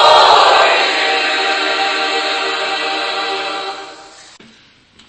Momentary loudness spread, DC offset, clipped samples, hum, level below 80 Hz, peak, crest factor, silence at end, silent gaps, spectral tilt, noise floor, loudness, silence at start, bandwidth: 14 LU; under 0.1%; 0.1%; none; -58 dBFS; 0 dBFS; 14 dB; 1 s; none; -0.5 dB/octave; -47 dBFS; -13 LUFS; 0 s; 11 kHz